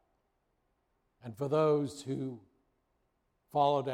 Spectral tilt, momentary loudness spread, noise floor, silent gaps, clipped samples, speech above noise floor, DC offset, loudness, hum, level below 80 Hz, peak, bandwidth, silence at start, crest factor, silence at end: -7 dB/octave; 21 LU; -78 dBFS; none; under 0.1%; 47 dB; under 0.1%; -32 LUFS; none; -74 dBFS; -16 dBFS; 14.5 kHz; 1.25 s; 18 dB; 0 s